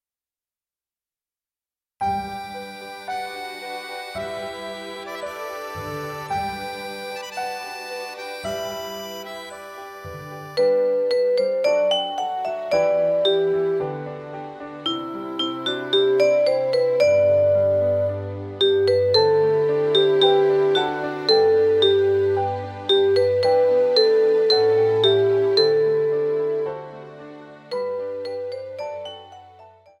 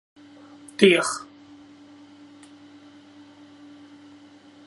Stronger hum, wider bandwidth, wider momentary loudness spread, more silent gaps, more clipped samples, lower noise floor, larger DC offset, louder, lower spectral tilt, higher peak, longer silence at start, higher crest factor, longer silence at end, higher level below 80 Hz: neither; first, 15.5 kHz vs 11.5 kHz; second, 16 LU vs 30 LU; neither; neither; first, under -90 dBFS vs -50 dBFS; neither; about the same, -21 LUFS vs -20 LUFS; about the same, -5 dB/octave vs -4 dB/octave; second, -6 dBFS vs 0 dBFS; first, 2 s vs 0.8 s; second, 16 dB vs 28 dB; second, 0.3 s vs 3.4 s; first, -60 dBFS vs -74 dBFS